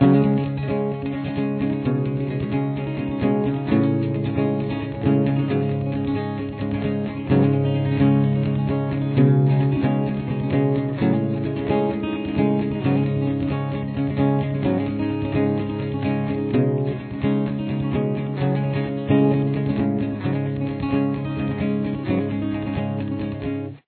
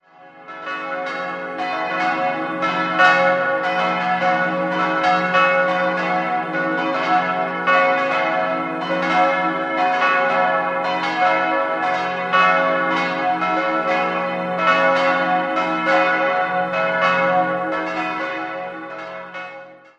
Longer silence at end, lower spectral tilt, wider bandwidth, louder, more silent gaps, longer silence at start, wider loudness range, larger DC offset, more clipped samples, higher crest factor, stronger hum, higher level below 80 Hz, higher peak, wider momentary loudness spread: about the same, 0.1 s vs 0.2 s; first, -12.5 dB/octave vs -5 dB/octave; second, 4.5 kHz vs 8.6 kHz; second, -22 LUFS vs -19 LUFS; neither; second, 0 s vs 0.2 s; about the same, 3 LU vs 2 LU; neither; neither; about the same, 18 dB vs 18 dB; neither; first, -46 dBFS vs -64 dBFS; about the same, -4 dBFS vs -2 dBFS; second, 7 LU vs 10 LU